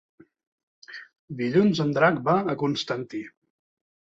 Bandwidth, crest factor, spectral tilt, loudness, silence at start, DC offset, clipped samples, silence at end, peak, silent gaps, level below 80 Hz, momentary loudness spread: 7.8 kHz; 20 dB; -6.5 dB/octave; -24 LUFS; 0.9 s; under 0.1%; under 0.1%; 0.85 s; -6 dBFS; 1.19-1.28 s; -66 dBFS; 21 LU